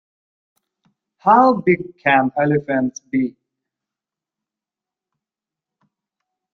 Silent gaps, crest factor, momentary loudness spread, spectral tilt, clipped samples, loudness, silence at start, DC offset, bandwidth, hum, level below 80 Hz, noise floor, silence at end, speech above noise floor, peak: none; 20 dB; 10 LU; -6.5 dB/octave; under 0.1%; -17 LUFS; 1.25 s; under 0.1%; 6.6 kHz; none; -62 dBFS; -88 dBFS; 3.25 s; 71 dB; -2 dBFS